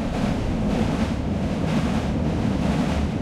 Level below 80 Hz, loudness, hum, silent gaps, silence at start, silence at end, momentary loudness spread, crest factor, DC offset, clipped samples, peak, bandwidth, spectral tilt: -30 dBFS; -24 LUFS; none; none; 0 s; 0 s; 2 LU; 12 dB; under 0.1%; under 0.1%; -10 dBFS; 13 kHz; -7 dB/octave